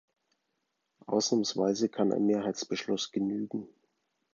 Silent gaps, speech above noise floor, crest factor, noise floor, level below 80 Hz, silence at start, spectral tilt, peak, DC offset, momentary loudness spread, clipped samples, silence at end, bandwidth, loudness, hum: none; 51 dB; 18 dB; -81 dBFS; -76 dBFS; 1.1 s; -4.5 dB/octave; -14 dBFS; under 0.1%; 7 LU; under 0.1%; 0.7 s; 7.6 kHz; -30 LUFS; none